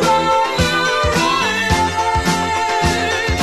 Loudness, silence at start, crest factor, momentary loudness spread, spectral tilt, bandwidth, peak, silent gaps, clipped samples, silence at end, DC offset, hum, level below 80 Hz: -16 LUFS; 0 s; 14 dB; 2 LU; -3.5 dB/octave; 13.5 kHz; -2 dBFS; none; under 0.1%; 0 s; 0.7%; none; -28 dBFS